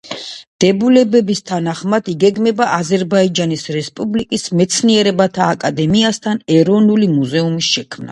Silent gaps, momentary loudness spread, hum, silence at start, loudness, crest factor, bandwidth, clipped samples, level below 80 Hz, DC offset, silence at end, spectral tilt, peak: 0.47-0.59 s; 8 LU; none; 0.05 s; -14 LUFS; 14 dB; 11.5 kHz; under 0.1%; -52 dBFS; under 0.1%; 0 s; -5 dB/octave; 0 dBFS